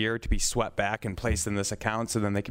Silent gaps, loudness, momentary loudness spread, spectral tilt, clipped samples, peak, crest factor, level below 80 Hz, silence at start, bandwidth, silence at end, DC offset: none; -29 LUFS; 3 LU; -4 dB/octave; under 0.1%; -10 dBFS; 18 dB; -36 dBFS; 0 s; 16 kHz; 0 s; under 0.1%